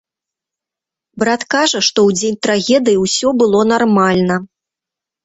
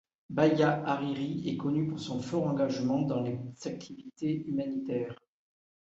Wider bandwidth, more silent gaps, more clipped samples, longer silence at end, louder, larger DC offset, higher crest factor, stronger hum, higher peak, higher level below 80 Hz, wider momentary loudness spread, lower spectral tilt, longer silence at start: about the same, 8.4 kHz vs 8 kHz; neither; neither; about the same, 0.8 s vs 0.75 s; first, -13 LUFS vs -31 LUFS; neither; second, 14 dB vs 20 dB; neither; first, 0 dBFS vs -12 dBFS; first, -54 dBFS vs -68 dBFS; second, 5 LU vs 13 LU; second, -4 dB/octave vs -7 dB/octave; first, 1.15 s vs 0.3 s